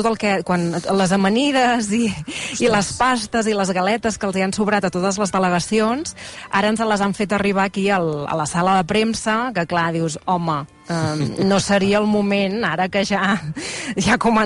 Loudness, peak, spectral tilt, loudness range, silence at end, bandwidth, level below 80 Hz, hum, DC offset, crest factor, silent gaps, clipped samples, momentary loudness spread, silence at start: -19 LUFS; -6 dBFS; -4.5 dB/octave; 1 LU; 0 s; 11.5 kHz; -48 dBFS; none; under 0.1%; 14 dB; none; under 0.1%; 6 LU; 0 s